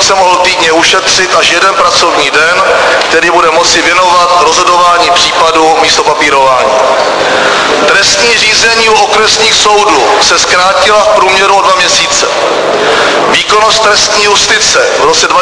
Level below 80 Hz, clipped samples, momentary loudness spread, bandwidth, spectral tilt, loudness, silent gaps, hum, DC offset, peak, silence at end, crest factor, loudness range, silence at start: -38 dBFS; 2%; 3 LU; 11 kHz; -0.5 dB/octave; -5 LUFS; none; none; under 0.1%; 0 dBFS; 0 s; 6 dB; 1 LU; 0 s